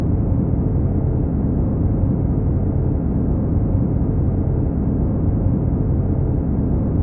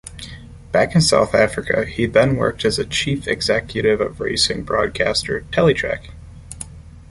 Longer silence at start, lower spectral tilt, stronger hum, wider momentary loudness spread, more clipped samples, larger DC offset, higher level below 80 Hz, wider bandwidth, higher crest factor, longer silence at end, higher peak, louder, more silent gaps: about the same, 0 s vs 0.05 s; first, -16 dB/octave vs -4.5 dB/octave; neither; second, 1 LU vs 19 LU; neither; neither; first, -24 dBFS vs -40 dBFS; second, 2.4 kHz vs 11.5 kHz; second, 10 dB vs 18 dB; about the same, 0 s vs 0.05 s; second, -6 dBFS vs -2 dBFS; about the same, -20 LUFS vs -18 LUFS; neither